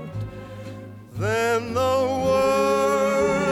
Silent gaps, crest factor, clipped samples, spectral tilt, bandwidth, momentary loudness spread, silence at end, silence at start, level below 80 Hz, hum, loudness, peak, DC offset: none; 12 dB; under 0.1%; -5 dB/octave; 16.5 kHz; 17 LU; 0 s; 0 s; -50 dBFS; none; -21 LUFS; -10 dBFS; under 0.1%